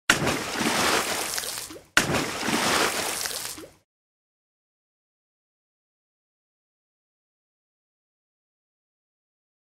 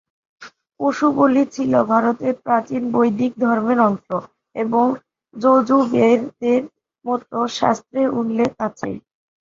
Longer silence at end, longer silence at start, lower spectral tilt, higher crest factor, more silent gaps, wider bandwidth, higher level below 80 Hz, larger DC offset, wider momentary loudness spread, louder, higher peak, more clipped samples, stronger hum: first, 5.95 s vs 0.45 s; second, 0.1 s vs 0.4 s; second, -2 dB/octave vs -6.5 dB/octave; first, 28 dB vs 18 dB; neither; first, 16 kHz vs 7.6 kHz; about the same, -56 dBFS vs -60 dBFS; neither; about the same, 10 LU vs 12 LU; second, -25 LUFS vs -19 LUFS; about the same, -2 dBFS vs -2 dBFS; neither; neither